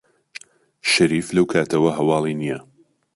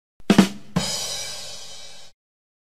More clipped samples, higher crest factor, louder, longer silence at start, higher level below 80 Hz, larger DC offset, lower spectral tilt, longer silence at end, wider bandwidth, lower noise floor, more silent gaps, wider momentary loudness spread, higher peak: neither; second, 18 dB vs 24 dB; first, -19 LUFS vs -22 LUFS; first, 0.85 s vs 0.3 s; about the same, -56 dBFS vs -52 dBFS; second, under 0.1% vs 1%; about the same, -5 dB/octave vs -4.5 dB/octave; about the same, 0.55 s vs 0.55 s; second, 11.5 kHz vs 15.5 kHz; about the same, -43 dBFS vs -42 dBFS; neither; about the same, 22 LU vs 21 LU; second, -4 dBFS vs 0 dBFS